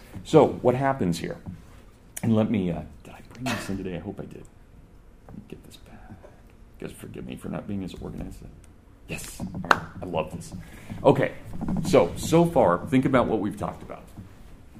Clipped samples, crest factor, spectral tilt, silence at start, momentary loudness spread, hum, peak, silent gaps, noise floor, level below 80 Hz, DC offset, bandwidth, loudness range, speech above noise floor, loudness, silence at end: under 0.1%; 26 dB; -6.5 dB/octave; 0 s; 23 LU; none; -2 dBFS; none; -50 dBFS; -46 dBFS; under 0.1%; 15.5 kHz; 16 LU; 24 dB; -25 LUFS; 0 s